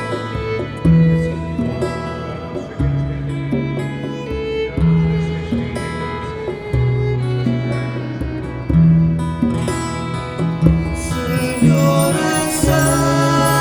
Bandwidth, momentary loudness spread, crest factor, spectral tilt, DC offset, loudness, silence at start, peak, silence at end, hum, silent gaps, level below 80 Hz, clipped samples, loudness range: over 20 kHz; 11 LU; 16 dB; -6 dB/octave; under 0.1%; -18 LUFS; 0 s; 0 dBFS; 0 s; none; none; -32 dBFS; under 0.1%; 5 LU